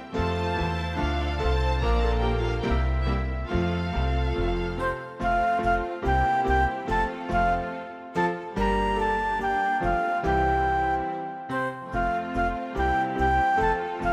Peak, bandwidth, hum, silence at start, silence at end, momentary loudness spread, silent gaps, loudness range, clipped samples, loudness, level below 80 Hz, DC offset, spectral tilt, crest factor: -10 dBFS; 9.4 kHz; none; 0 s; 0 s; 6 LU; none; 1 LU; under 0.1%; -26 LUFS; -32 dBFS; under 0.1%; -7 dB/octave; 14 dB